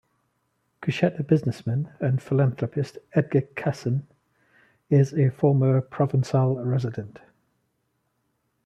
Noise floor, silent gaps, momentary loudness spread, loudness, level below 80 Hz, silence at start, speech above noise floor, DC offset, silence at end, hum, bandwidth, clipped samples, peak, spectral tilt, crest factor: -74 dBFS; none; 9 LU; -24 LUFS; -64 dBFS; 0.8 s; 51 dB; under 0.1%; 1.55 s; none; 8.2 kHz; under 0.1%; -6 dBFS; -8.5 dB/octave; 18 dB